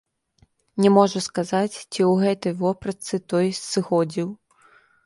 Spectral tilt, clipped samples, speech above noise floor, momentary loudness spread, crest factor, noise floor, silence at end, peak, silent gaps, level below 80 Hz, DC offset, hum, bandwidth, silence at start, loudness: -5.5 dB/octave; under 0.1%; 40 dB; 11 LU; 18 dB; -62 dBFS; 0.7 s; -4 dBFS; none; -64 dBFS; under 0.1%; none; 11.5 kHz; 0.75 s; -22 LUFS